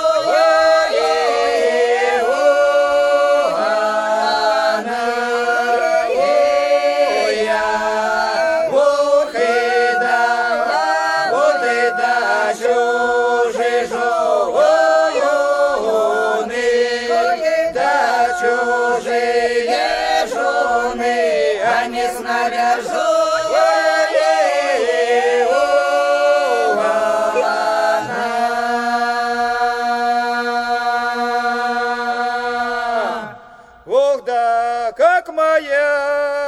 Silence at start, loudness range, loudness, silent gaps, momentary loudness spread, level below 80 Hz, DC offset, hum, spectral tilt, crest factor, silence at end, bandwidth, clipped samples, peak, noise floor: 0 s; 3 LU; -16 LUFS; none; 4 LU; -54 dBFS; under 0.1%; none; -2 dB/octave; 12 dB; 0 s; 13.5 kHz; under 0.1%; -4 dBFS; -42 dBFS